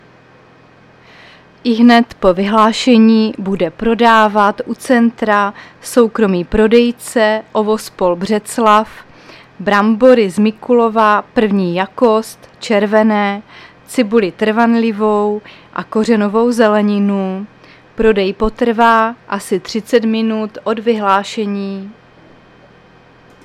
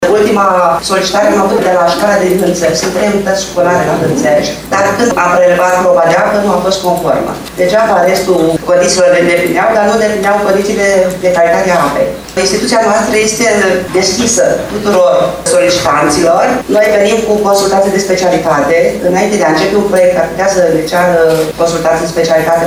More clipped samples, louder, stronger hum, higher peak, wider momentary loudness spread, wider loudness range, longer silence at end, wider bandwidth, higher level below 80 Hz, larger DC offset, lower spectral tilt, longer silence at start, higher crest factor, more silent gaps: neither; second, -13 LUFS vs -9 LUFS; neither; about the same, 0 dBFS vs 0 dBFS; first, 11 LU vs 4 LU; about the same, 3 LU vs 1 LU; first, 1.55 s vs 0 s; second, 14 kHz vs 19 kHz; about the same, -40 dBFS vs -38 dBFS; neither; first, -5.5 dB/octave vs -4 dB/octave; first, 1.65 s vs 0 s; about the same, 14 dB vs 10 dB; neither